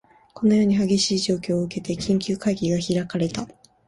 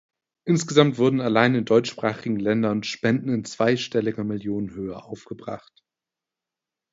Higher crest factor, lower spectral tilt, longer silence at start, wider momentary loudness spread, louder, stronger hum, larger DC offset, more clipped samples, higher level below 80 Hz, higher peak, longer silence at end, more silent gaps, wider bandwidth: second, 14 dB vs 24 dB; about the same, -5.5 dB/octave vs -6 dB/octave; about the same, 0.35 s vs 0.45 s; second, 9 LU vs 16 LU; about the same, -22 LUFS vs -22 LUFS; neither; neither; neither; first, -54 dBFS vs -60 dBFS; second, -8 dBFS vs 0 dBFS; second, 0.4 s vs 1.35 s; neither; first, 11.5 kHz vs 8 kHz